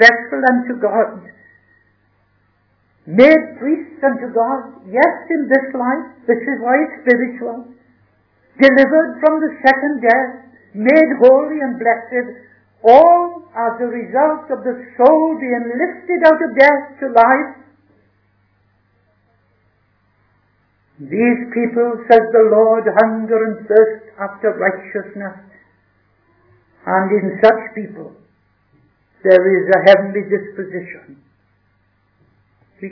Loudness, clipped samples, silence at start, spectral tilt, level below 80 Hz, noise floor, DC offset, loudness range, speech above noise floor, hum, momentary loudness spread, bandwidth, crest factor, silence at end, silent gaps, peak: -14 LUFS; 0.4%; 0 s; -7 dB/octave; -60 dBFS; -60 dBFS; under 0.1%; 6 LU; 46 dB; 50 Hz at -55 dBFS; 16 LU; 5.4 kHz; 16 dB; 0 s; none; 0 dBFS